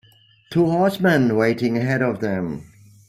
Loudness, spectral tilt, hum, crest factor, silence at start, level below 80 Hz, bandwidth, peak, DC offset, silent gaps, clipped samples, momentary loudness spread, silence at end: -20 LUFS; -7.5 dB/octave; none; 16 dB; 0.5 s; -56 dBFS; 15.5 kHz; -4 dBFS; under 0.1%; none; under 0.1%; 9 LU; 0.45 s